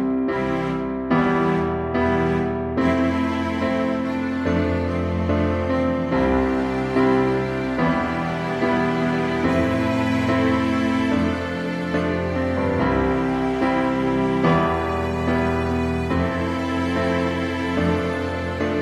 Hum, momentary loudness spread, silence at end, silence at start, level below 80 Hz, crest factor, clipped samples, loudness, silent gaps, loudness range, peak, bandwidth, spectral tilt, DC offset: none; 4 LU; 0 s; 0 s; -38 dBFS; 16 dB; under 0.1%; -21 LUFS; none; 1 LU; -6 dBFS; 10.5 kHz; -7.5 dB/octave; under 0.1%